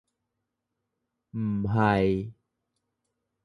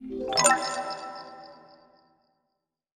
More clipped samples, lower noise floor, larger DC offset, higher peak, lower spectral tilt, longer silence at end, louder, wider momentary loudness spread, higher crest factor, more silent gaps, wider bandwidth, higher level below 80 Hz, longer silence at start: neither; about the same, -83 dBFS vs -81 dBFS; neither; second, -10 dBFS vs -4 dBFS; first, -9 dB/octave vs -1 dB/octave; second, 1.1 s vs 1.35 s; about the same, -26 LUFS vs -25 LUFS; second, 16 LU vs 23 LU; second, 20 dB vs 26 dB; neither; second, 10.5 kHz vs over 20 kHz; first, -52 dBFS vs -64 dBFS; first, 1.35 s vs 0 s